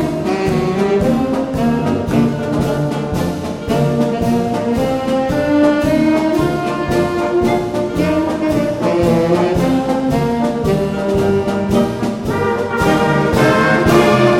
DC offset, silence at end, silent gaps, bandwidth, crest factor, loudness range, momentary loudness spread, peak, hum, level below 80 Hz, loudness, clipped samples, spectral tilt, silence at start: under 0.1%; 0 s; none; 16.5 kHz; 14 dB; 2 LU; 5 LU; 0 dBFS; none; -36 dBFS; -15 LUFS; under 0.1%; -6.5 dB/octave; 0 s